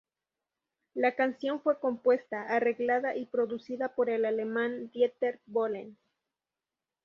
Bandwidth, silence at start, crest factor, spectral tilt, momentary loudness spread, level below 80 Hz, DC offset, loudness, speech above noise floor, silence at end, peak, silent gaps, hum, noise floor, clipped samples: 6 kHz; 0.95 s; 18 dB; -6.5 dB/octave; 6 LU; -80 dBFS; under 0.1%; -30 LUFS; over 60 dB; 1.1 s; -14 dBFS; none; none; under -90 dBFS; under 0.1%